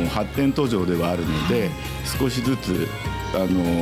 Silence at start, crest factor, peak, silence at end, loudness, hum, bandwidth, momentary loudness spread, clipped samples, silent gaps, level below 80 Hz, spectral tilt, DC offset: 0 s; 14 dB; -8 dBFS; 0 s; -23 LUFS; none; 16 kHz; 6 LU; under 0.1%; none; -38 dBFS; -6 dB/octave; under 0.1%